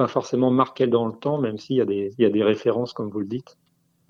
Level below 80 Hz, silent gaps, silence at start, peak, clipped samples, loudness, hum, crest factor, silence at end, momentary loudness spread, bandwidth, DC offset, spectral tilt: -72 dBFS; none; 0 s; -4 dBFS; under 0.1%; -23 LUFS; none; 20 dB; 0.7 s; 9 LU; 7.4 kHz; under 0.1%; -7.5 dB/octave